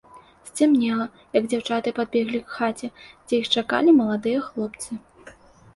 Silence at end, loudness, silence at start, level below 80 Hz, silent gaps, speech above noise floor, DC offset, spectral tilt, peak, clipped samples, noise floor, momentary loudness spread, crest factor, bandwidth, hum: 0.45 s; -22 LUFS; 0.15 s; -62 dBFS; none; 26 dB; under 0.1%; -4.5 dB/octave; -6 dBFS; under 0.1%; -48 dBFS; 16 LU; 18 dB; 11.5 kHz; none